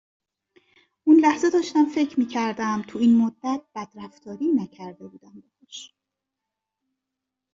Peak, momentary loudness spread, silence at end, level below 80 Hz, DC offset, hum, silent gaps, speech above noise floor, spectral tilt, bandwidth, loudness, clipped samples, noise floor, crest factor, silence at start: -6 dBFS; 23 LU; 1.65 s; -70 dBFS; under 0.1%; none; none; 62 dB; -5.5 dB/octave; 7.6 kHz; -22 LUFS; under 0.1%; -85 dBFS; 18 dB; 1.05 s